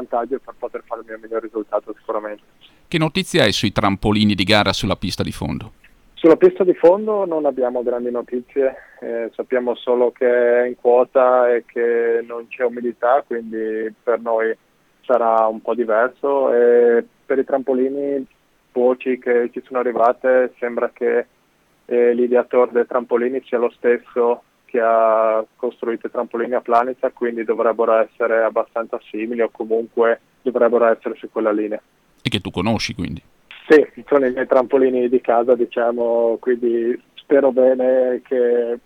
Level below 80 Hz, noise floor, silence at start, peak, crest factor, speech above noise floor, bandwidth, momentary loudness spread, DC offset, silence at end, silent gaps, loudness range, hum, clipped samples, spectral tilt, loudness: -48 dBFS; -59 dBFS; 0 s; -2 dBFS; 16 dB; 42 dB; 13 kHz; 12 LU; under 0.1%; 0.05 s; none; 3 LU; none; under 0.1%; -5.5 dB/octave; -18 LUFS